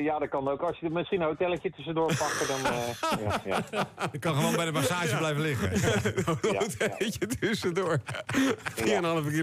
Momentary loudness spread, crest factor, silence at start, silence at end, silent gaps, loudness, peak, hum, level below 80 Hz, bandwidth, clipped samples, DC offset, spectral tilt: 4 LU; 14 dB; 0 s; 0 s; none; -29 LUFS; -16 dBFS; none; -58 dBFS; 16 kHz; under 0.1%; under 0.1%; -5 dB/octave